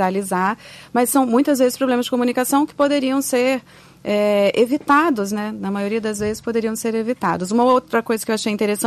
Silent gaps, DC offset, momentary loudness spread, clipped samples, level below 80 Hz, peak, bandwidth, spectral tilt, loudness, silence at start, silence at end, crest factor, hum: none; under 0.1%; 8 LU; under 0.1%; -56 dBFS; -4 dBFS; 14 kHz; -4.5 dB/octave; -19 LUFS; 0 s; 0 s; 14 dB; none